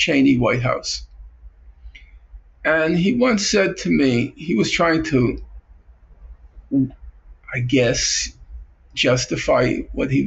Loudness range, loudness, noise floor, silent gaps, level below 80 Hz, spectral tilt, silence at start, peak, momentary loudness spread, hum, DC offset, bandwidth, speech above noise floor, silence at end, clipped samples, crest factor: 5 LU; -19 LUFS; -48 dBFS; none; -40 dBFS; -4.5 dB/octave; 0 s; -6 dBFS; 9 LU; none; under 0.1%; 8.2 kHz; 30 dB; 0 s; under 0.1%; 14 dB